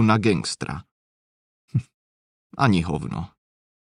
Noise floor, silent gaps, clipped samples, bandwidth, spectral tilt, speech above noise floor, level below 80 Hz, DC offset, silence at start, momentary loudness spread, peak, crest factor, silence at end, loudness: under -90 dBFS; 0.91-1.68 s, 1.94-2.50 s; under 0.1%; 11 kHz; -6 dB/octave; over 68 dB; -48 dBFS; under 0.1%; 0 s; 16 LU; -4 dBFS; 20 dB; 0.65 s; -24 LUFS